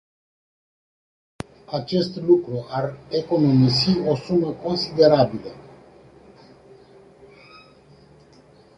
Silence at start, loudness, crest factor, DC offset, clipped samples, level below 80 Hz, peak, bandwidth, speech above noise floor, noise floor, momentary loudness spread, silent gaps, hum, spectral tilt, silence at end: 1.7 s; -20 LUFS; 20 dB; under 0.1%; under 0.1%; -54 dBFS; -2 dBFS; 11 kHz; 31 dB; -51 dBFS; 17 LU; none; none; -7.5 dB/octave; 3.15 s